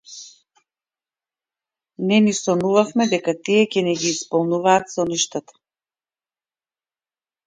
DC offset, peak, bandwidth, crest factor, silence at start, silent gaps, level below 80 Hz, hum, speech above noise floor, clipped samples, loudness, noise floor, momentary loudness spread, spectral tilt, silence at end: under 0.1%; -2 dBFS; 9.6 kHz; 20 dB; 0.1 s; none; -66 dBFS; none; over 71 dB; under 0.1%; -19 LUFS; under -90 dBFS; 8 LU; -4 dB/octave; 2.05 s